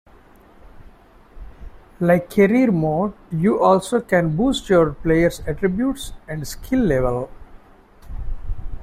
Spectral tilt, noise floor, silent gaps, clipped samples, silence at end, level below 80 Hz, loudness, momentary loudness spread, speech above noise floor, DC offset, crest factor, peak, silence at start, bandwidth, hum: -6.5 dB/octave; -48 dBFS; none; under 0.1%; 0 s; -36 dBFS; -19 LUFS; 18 LU; 30 dB; under 0.1%; 18 dB; -2 dBFS; 0.75 s; 16 kHz; none